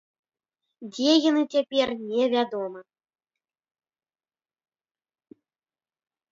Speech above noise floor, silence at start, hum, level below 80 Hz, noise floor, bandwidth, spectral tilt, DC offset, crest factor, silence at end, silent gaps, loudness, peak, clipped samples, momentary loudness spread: over 66 dB; 0.8 s; none; -74 dBFS; under -90 dBFS; 7.6 kHz; -3.5 dB/octave; under 0.1%; 20 dB; 3.5 s; none; -24 LUFS; -8 dBFS; under 0.1%; 15 LU